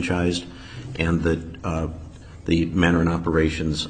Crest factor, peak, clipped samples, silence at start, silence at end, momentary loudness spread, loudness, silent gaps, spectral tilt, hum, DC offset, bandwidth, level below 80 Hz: 18 dB; -4 dBFS; under 0.1%; 0 s; 0 s; 17 LU; -23 LUFS; none; -6 dB/octave; none; 0.1%; 9.4 kHz; -36 dBFS